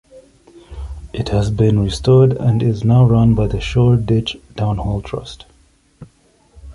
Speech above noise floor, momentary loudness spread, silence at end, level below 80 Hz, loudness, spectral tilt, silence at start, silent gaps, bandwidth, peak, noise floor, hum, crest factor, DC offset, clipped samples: 39 dB; 16 LU; 0 s; -32 dBFS; -15 LUFS; -8 dB/octave; 0.15 s; none; 11 kHz; -2 dBFS; -53 dBFS; none; 14 dB; under 0.1%; under 0.1%